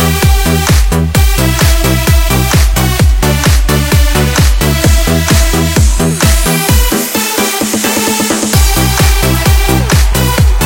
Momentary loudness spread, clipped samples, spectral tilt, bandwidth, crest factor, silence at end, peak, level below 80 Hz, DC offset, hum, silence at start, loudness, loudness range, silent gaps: 2 LU; 0.2%; -4 dB/octave; 17 kHz; 8 dB; 0 s; 0 dBFS; -12 dBFS; under 0.1%; none; 0 s; -10 LUFS; 1 LU; none